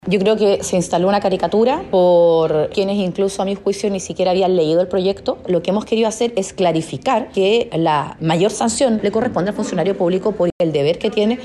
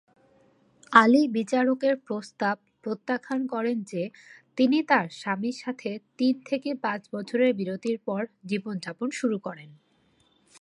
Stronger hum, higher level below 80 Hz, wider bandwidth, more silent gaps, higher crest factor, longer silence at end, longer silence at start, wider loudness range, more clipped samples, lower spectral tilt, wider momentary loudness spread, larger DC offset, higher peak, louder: neither; first, -50 dBFS vs -80 dBFS; about the same, 12 kHz vs 11 kHz; first, 10.52-10.59 s vs none; second, 12 dB vs 26 dB; second, 0 s vs 0.9 s; second, 0.05 s vs 0.9 s; second, 2 LU vs 5 LU; neither; about the same, -5.5 dB/octave vs -5.5 dB/octave; second, 5 LU vs 14 LU; neither; about the same, -4 dBFS vs -2 dBFS; first, -17 LUFS vs -26 LUFS